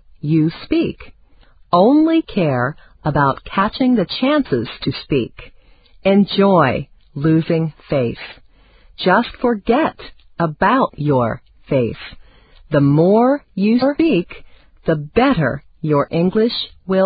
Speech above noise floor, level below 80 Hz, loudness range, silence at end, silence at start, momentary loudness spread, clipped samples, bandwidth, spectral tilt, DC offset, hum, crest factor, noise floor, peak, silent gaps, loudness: 32 dB; -44 dBFS; 3 LU; 0 s; 0.25 s; 11 LU; under 0.1%; 5 kHz; -12 dB/octave; under 0.1%; none; 16 dB; -48 dBFS; 0 dBFS; none; -17 LUFS